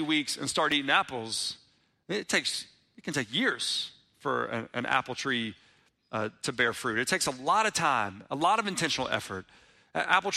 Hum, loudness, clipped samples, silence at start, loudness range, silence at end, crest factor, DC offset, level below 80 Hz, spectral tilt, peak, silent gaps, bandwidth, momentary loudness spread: none; -29 LUFS; under 0.1%; 0 s; 3 LU; 0 s; 22 dB; under 0.1%; -68 dBFS; -2.5 dB/octave; -10 dBFS; none; 15.5 kHz; 11 LU